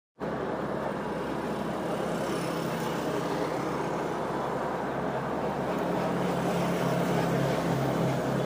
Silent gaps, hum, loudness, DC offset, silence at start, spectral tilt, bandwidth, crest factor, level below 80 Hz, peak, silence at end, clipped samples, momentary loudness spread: none; none; -30 LUFS; under 0.1%; 0.2 s; -6.5 dB/octave; 15.5 kHz; 14 dB; -54 dBFS; -16 dBFS; 0 s; under 0.1%; 5 LU